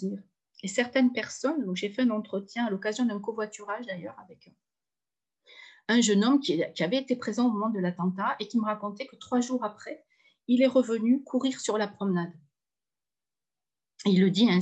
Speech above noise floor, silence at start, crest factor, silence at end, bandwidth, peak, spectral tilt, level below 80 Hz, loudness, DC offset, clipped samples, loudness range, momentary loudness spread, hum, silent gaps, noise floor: over 63 dB; 0 s; 18 dB; 0 s; 9 kHz; -12 dBFS; -5 dB/octave; -78 dBFS; -28 LUFS; under 0.1%; under 0.1%; 5 LU; 15 LU; none; none; under -90 dBFS